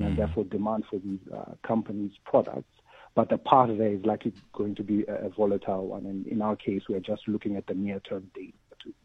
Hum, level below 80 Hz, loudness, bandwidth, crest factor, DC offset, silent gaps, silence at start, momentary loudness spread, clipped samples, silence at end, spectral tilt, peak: none; -50 dBFS; -29 LUFS; 6 kHz; 26 dB; under 0.1%; none; 0 s; 12 LU; under 0.1%; 0.15 s; -9.5 dB/octave; -4 dBFS